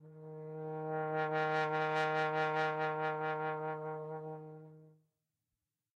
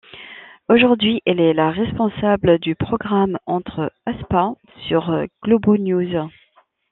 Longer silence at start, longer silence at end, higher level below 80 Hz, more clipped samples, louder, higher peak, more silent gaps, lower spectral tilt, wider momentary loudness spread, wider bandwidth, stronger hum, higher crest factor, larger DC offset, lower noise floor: second, 0 s vs 0.15 s; first, 1.05 s vs 0.65 s; second, -88 dBFS vs -48 dBFS; neither; second, -36 LUFS vs -18 LUFS; second, -22 dBFS vs -2 dBFS; neither; second, -6.5 dB/octave vs -10 dB/octave; about the same, 15 LU vs 13 LU; first, 9 kHz vs 4.2 kHz; neither; about the same, 16 dB vs 16 dB; neither; first, under -90 dBFS vs -57 dBFS